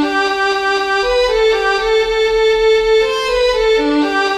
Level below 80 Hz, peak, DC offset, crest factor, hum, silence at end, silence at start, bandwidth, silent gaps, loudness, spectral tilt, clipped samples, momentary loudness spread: -36 dBFS; -4 dBFS; under 0.1%; 10 dB; none; 0 s; 0 s; 12 kHz; none; -14 LUFS; -3 dB/octave; under 0.1%; 3 LU